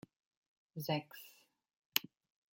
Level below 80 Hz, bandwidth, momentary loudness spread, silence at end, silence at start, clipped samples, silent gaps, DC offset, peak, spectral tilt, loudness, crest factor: -84 dBFS; 17 kHz; 19 LU; 0.5 s; 0.75 s; under 0.1%; 1.76-1.90 s; under 0.1%; -8 dBFS; -3.5 dB/octave; -39 LUFS; 36 dB